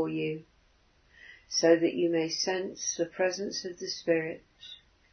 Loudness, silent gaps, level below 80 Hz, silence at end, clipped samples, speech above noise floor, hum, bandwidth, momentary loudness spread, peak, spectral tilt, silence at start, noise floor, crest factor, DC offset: -29 LUFS; none; -70 dBFS; 0.35 s; under 0.1%; 36 dB; none; 6.6 kHz; 21 LU; -10 dBFS; -3.5 dB/octave; 0 s; -65 dBFS; 22 dB; under 0.1%